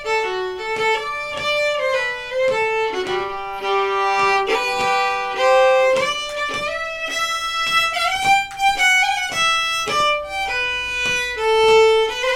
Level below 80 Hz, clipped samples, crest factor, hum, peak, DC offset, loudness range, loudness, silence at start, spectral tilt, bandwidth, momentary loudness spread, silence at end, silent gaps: -48 dBFS; under 0.1%; 16 dB; none; -4 dBFS; under 0.1%; 3 LU; -18 LUFS; 0 s; -1.5 dB/octave; 17 kHz; 9 LU; 0 s; none